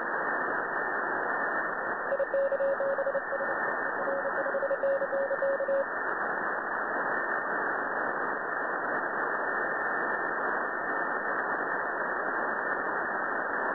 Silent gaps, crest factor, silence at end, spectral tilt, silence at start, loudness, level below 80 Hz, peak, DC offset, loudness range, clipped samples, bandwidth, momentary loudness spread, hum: none; 14 dB; 0 s; -8.5 dB/octave; 0 s; -30 LUFS; -70 dBFS; -18 dBFS; under 0.1%; 1 LU; under 0.1%; 4.3 kHz; 2 LU; none